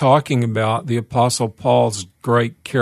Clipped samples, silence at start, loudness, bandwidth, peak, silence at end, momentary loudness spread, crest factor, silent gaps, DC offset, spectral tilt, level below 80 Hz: under 0.1%; 0 s; -18 LUFS; 13.5 kHz; -2 dBFS; 0 s; 5 LU; 16 dB; none; under 0.1%; -5.5 dB/octave; -56 dBFS